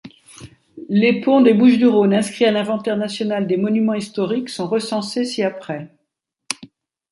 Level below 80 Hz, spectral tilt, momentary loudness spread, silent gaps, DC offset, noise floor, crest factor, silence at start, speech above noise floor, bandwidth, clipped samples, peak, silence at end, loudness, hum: -64 dBFS; -5.5 dB/octave; 16 LU; none; under 0.1%; -75 dBFS; 16 dB; 0.05 s; 58 dB; 11.5 kHz; under 0.1%; -2 dBFS; 0.45 s; -18 LUFS; none